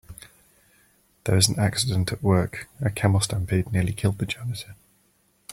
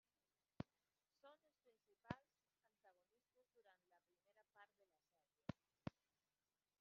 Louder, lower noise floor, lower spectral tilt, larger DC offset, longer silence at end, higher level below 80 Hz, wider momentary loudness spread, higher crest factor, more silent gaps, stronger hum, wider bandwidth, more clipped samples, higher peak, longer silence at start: first, -24 LUFS vs -59 LUFS; second, -65 dBFS vs under -90 dBFS; second, -4.5 dB/octave vs -6 dB/octave; neither; about the same, 0.8 s vs 0.9 s; first, -50 dBFS vs -84 dBFS; first, 13 LU vs 2 LU; second, 20 dB vs 34 dB; neither; neither; first, 16 kHz vs 6.4 kHz; neither; first, -4 dBFS vs -30 dBFS; second, 0.1 s vs 0.6 s